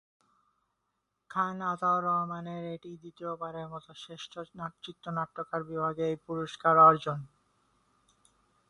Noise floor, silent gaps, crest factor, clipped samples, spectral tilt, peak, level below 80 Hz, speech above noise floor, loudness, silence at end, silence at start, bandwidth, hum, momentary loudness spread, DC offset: -82 dBFS; none; 22 dB; under 0.1%; -6.5 dB/octave; -10 dBFS; -72 dBFS; 51 dB; -29 LUFS; 1.45 s; 1.3 s; 11 kHz; none; 22 LU; under 0.1%